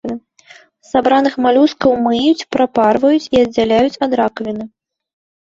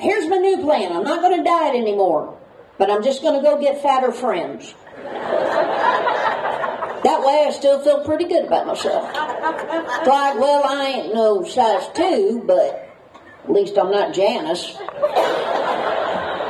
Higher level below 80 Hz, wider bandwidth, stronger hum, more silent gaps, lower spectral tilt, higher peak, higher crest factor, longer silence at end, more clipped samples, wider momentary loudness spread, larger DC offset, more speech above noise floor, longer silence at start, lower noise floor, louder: first, -50 dBFS vs -64 dBFS; second, 7.8 kHz vs 12.5 kHz; neither; neither; first, -5.5 dB/octave vs -4 dB/octave; about the same, -2 dBFS vs -2 dBFS; about the same, 14 dB vs 16 dB; first, 0.75 s vs 0 s; neither; first, 12 LU vs 8 LU; neither; first, 32 dB vs 26 dB; about the same, 0.05 s vs 0 s; about the same, -45 dBFS vs -44 dBFS; first, -14 LUFS vs -18 LUFS